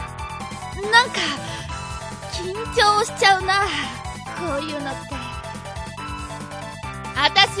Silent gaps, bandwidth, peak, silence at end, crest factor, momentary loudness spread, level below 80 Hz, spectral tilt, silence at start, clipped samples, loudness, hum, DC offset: none; 11 kHz; 0 dBFS; 0 s; 22 dB; 16 LU; -40 dBFS; -2.5 dB/octave; 0 s; under 0.1%; -21 LUFS; none; under 0.1%